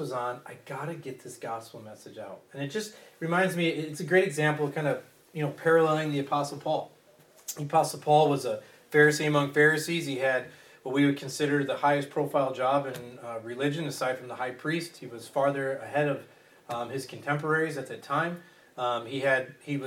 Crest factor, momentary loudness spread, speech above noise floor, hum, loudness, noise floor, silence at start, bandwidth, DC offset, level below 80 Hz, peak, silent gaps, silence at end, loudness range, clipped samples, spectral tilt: 20 dB; 18 LU; 30 dB; none; -28 LUFS; -58 dBFS; 0 s; 17.5 kHz; under 0.1%; -78 dBFS; -8 dBFS; none; 0 s; 7 LU; under 0.1%; -5 dB/octave